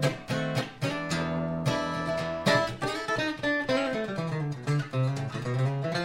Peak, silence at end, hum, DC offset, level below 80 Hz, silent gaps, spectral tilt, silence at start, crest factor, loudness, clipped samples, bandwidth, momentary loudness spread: -10 dBFS; 0 s; none; under 0.1%; -56 dBFS; none; -5.5 dB/octave; 0 s; 18 dB; -29 LUFS; under 0.1%; 16 kHz; 6 LU